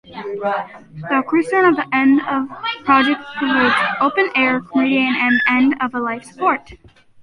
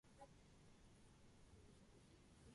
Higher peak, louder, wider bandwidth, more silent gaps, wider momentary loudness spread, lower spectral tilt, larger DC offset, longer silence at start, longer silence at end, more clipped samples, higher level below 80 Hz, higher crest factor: first, -2 dBFS vs -50 dBFS; first, -17 LUFS vs -69 LUFS; about the same, 10.5 kHz vs 11.5 kHz; neither; first, 10 LU vs 3 LU; about the same, -5.5 dB/octave vs -5 dB/octave; neither; about the same, 0.1 s vs 0.05 s; first, 0.5 s vs 0 s; neither; first, -56 dBFS vs -74 dBFS; about the same, 16 dB vs 16 dB